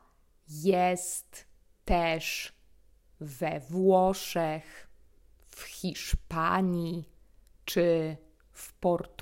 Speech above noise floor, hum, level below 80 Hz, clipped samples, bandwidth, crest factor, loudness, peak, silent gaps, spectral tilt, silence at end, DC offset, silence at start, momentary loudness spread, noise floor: 33 dB; none; -44 dBFS; under 0.1%; 16 kHz; 18 dB; -30 LUFS; -12 dBFS; none; -5 dB/octave; 0.15 s; under 0.1%; 0.5 s; 21 LU; -62 dBFS